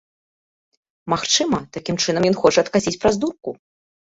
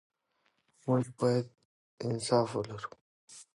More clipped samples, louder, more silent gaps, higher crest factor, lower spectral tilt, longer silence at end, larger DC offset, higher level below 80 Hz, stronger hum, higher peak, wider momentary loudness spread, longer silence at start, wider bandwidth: neither; first, -19 LUFS vs -32 LUFS; second, none vs 1.65-1.98 s, 3.01-3.28 s; about the same, 20 dB vs 20 dB; second, -3.5 dB/octave vs -6 dB/octave; first, 0.6 s vs 0.1 s; neither; first, -52 dBFS vs -72 dBFS; neither; first, -2 dBFS vs -14 dBFS; second, 12 LU vs 17 LU; first, 1.05 s vs 0.85 s; second, 8 kHz vs 11.5 kHz